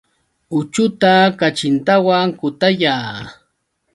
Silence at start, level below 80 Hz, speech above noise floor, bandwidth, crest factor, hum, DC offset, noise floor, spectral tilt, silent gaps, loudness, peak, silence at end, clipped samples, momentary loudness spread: 0.5 s; -58 dBFS; 53 dB; 11.5 kHz; 16 dB; none; under 0.1%; -68 dBFS; -5 dB/octave; none; -15 LUFS; 0 dBFS; 0.6 s; under 0.1%; 11 LU